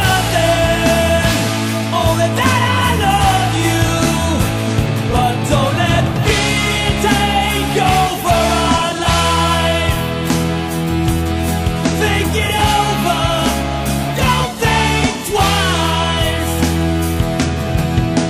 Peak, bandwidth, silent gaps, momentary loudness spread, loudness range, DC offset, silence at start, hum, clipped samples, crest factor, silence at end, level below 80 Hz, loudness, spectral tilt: -4 dBFS; 16.5 kHz; none; 4 LU; 2 LU; under 0.1%; 0 s; none; under 0.1%; 10 dB; 0 s; -26 dBFS; -15 LUFS; -4.5 dB/octave